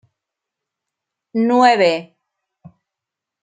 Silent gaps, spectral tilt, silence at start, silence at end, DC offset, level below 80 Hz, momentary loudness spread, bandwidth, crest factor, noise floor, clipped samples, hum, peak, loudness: none; -5 dB/octave; 1.35 s; 1.4 s; under 0.1%; -72 dBFS; 13 LU; 9.2 kHz; 20 dB; -84 dBFS; under 0.1%; none; -2 dBFS; -15 LUFS